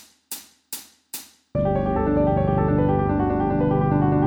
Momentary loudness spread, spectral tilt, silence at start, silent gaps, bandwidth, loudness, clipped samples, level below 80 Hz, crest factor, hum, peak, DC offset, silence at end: 15 LU; -7.5 dB/octave; 0.3 s; none; 19.5 kHz; -21 LUFS; under 0.1%; -36 dBFS; 14 dB; none; -8 dBFS; under 0.1%; 0 s